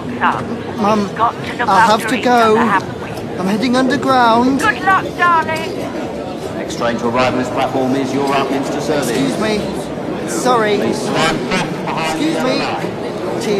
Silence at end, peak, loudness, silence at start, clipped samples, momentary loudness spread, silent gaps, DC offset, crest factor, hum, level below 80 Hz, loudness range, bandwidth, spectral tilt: 0 s; 0 dBFS; -16 LUFS; 0 s; under 0.1%; 11 LU; none; under 0.1%; 16 dB; none; -44 dBFS; 4 LU; 13.5 kHz; -5 dB/octave